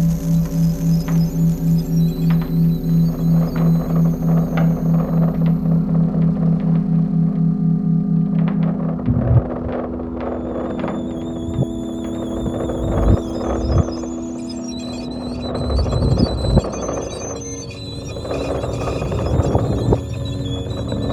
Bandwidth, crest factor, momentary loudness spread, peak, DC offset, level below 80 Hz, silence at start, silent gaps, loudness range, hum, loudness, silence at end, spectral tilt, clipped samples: 14 kHz; 16 dB; 9 LU; -2 dBFS; under 0.1%; -28 dBFS; 0 s; none; 5 LU; none; -19 LUFS; 0 s; -8 dB/octave; under 0.1%